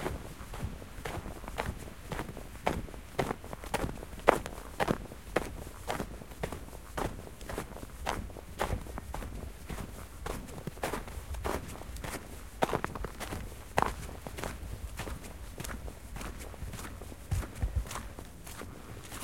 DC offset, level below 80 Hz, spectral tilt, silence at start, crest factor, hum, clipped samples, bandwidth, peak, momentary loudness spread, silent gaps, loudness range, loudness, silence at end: 0.2%; -44 dBFS; -5 dB/octave; 0 s; 36 dB; none; under 0.1%; 16.5 kHz; -2 dBFS; 11 LU; none; 6 LU; -38 LUFS; 0 s